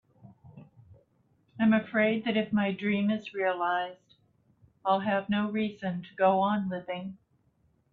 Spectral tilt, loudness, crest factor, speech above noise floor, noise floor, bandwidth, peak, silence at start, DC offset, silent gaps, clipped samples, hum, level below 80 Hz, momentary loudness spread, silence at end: -8.5 dB/octave; -29 LUFS; 18 dB; 41 dB; -69 dBFS; 4.5 kHz; -12 dBFS; 0.25 s; under 0.1%; none; under 0.1%; none; -70 dBFS; 11 LU; 0.8 s